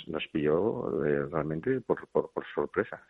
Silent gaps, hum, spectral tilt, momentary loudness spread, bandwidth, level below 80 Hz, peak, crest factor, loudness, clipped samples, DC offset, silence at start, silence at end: none; none; -9 dB/octave; 5 LU; 4 kHz; -60 dBFS; -12 dBFS; 18 dB; -31 LUFS; under 0.1%; under 0.1%; 0 s; 0.1 s